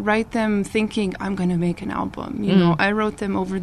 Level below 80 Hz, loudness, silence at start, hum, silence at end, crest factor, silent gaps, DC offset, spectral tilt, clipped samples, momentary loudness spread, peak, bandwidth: -46 dBFS; -21 LUFS; 0 s; none; 0 s; 16 dB; none; 0.2%; -7 dB/octave; under 0.1%; 9 LU; -4 dBFS; 11.5 kHz